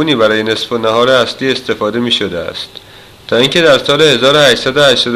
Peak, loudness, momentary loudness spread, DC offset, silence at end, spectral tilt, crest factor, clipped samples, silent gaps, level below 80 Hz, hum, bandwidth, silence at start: 0 dBFS; -10 LUFS; 10 LU; under 0.1%; 0 s; -4 dB/octave; 12 dB; 0.2%; none; -46 dBFS; none; 14.5 kHz; 0 s